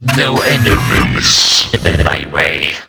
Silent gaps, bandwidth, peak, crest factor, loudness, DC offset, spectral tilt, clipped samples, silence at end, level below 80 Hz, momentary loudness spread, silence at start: none; over 20 kHz; 0 dBFS; 12 dB; -10 LUFS; under 0.1%; -3.5 dB/octave; under 0.1%; 0.05 s; -24 dBFS; 6 LU; 0 s